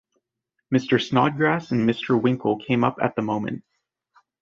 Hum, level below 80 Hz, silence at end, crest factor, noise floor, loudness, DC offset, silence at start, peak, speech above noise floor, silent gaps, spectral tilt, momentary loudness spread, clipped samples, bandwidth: none; -60 dBFS; 0.8 s; 20 dB; -79 dBFS; -22 LUFS; under 0.1%; 0.7 s; -4 dBFS; 57 dB; none; -7 dB/octave; 6 LU; under 0.1%; 7.2 kHz